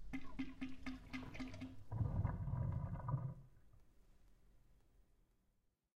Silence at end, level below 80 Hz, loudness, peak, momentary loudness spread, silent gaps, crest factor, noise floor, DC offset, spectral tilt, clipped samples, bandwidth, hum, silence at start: 1.25 s; -56 dBFS; -46 LUFS; -28 dBFS; 9 LU; none; 18 dB; -81 dBFS; under 0.1%; -8 dB/octave; under 0.1%; 8.8 kHz; none; 0 s